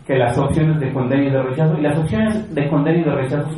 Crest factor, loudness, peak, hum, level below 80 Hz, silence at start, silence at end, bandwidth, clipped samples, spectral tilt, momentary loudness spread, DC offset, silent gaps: 14 dB; -18 LUFS; -4 dBFS; none; -42 dBFS; 0 s; 0 s; 11.5 kHz; under 0.1%; -8 dB/octave; 3 LU; under 0.1%; none